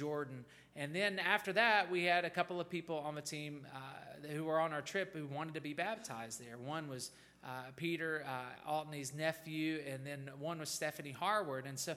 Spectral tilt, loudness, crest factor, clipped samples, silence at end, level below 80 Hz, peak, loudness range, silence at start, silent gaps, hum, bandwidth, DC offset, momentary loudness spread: -4 dB/octave; -39 LUFS; 24 dB; under 0.1%; 0 s; -80 dBFS; -16 dBFS; 7 LU; 0 s; none; none; 16.5 kHz; under 0.1%; 14 LU